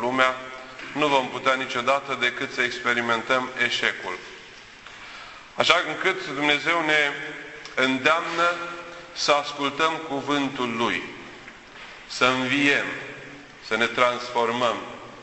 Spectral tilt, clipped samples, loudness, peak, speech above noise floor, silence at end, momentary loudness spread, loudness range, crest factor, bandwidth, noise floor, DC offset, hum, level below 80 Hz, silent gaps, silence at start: -3 dB/octave; under 0.1%; -23 LUFS; -2 dBFS; 21 dB; 0 s; 20 LU; 3 LU; 22 dB; 8.4 kHz; -45 dBFS; under 0.1%; none; -62 dBFS; none; 0 s